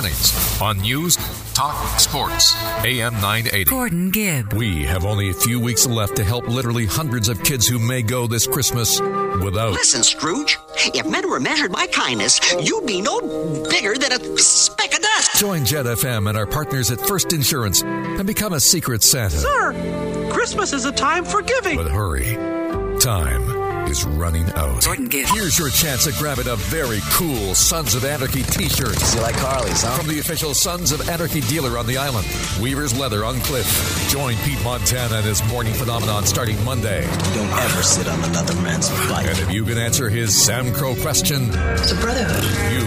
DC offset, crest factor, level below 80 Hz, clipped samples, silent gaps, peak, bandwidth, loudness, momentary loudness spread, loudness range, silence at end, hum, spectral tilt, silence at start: under 0.1%; 18 dB; -32 dBFS; under 0.1%; none; -2 dBFS; 16 kHz; -18 LUFS; 7 LU; 4 LU; 0 s; none; -3 dB/octave; 0 s